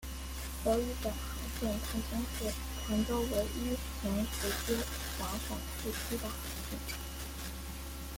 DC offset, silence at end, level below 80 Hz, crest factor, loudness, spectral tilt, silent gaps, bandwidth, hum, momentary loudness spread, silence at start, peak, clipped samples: under 0.1%; 0 s; -42 dBFS; 18 dB; -37 LUFS; -4.5 dB/octave; none; 17 kHz; none; 9 LU; 0 s; -18 dBFS; under 0.1%